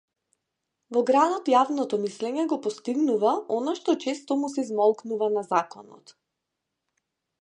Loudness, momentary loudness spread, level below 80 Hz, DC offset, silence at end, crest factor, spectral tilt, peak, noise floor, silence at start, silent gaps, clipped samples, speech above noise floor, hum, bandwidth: -25 LUFS; 7 LU; -84 dBFS; under 0.1%; 1.45 s; 20 dB; -5 dB/octave; -6 dBFS; -83 dBFS; 0.9 s; none; under 0.1%; 58 dB; none; 10 kHz